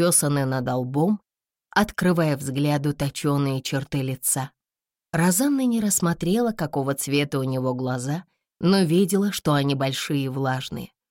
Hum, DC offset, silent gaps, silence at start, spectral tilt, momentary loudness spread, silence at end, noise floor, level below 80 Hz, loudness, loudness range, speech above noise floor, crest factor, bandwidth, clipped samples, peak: none; under 0.1%; none; 0 s; -5 dB/octave; 7 LU; 0.25 s; under -90 dBFS; -54 dBFS; -23 LUFS; 1 LU; over 67 dB; 16 dB; 17 kHz; under 0.1%; -8 dBFS